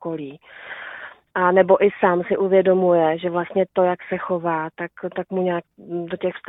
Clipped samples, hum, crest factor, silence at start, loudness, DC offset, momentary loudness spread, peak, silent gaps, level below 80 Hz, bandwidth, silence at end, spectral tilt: under 0.1%; none; 18 dB; 0 s; -20 LUFS; under 0.1%; 17 LU; -2 dBFS; none; -64 dBFS; 4 kHz; 0.1 s; -10.5 dB/octave